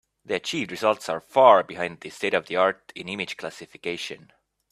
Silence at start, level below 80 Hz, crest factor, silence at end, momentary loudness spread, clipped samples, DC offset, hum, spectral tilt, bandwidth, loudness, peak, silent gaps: 0.3 s; -70 dBFS; 22 dB; 0.55 s; 18 LU; under 0.1%; under 0.1%; none; -4 dB/octave; 14 kHz; -24 LUFS; -2 dBFS; none